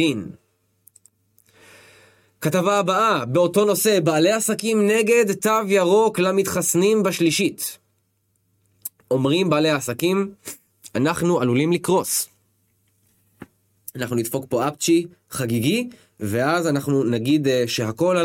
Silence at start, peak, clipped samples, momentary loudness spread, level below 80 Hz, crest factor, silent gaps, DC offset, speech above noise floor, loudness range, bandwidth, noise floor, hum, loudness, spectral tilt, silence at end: 0 s; -4 dBFS; under 0.1%; 13 LU; -62 dBFS; 18 dB; none; under 0.1%; 49 dB; 6 LU; 17 kHz; -68 dBFS; none; -20 LUFS; -4.5 dB/octave; 0 s